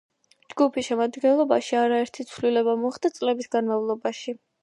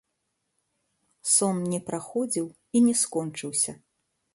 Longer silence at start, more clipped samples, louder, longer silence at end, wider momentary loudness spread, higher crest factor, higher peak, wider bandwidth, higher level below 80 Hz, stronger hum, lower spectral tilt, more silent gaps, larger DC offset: second, 0.55 s vs 1.25 s; neither; about the same, -24 LUFS vs -25 LUFS; second, 0.25 s vs 0.6 s; about the same, 9 LU vs 10 LU; about the same, 18 dB vs 20 dB; about the same, -6 dBFS vs -8 dBFS; about the same, 11.5 kHz vs 11.5 kHz; about the same, -72 dBFS vs -70 dBFS; neither; about the same, -4.5 dB/octave vs -4 dB/octave; neither; neither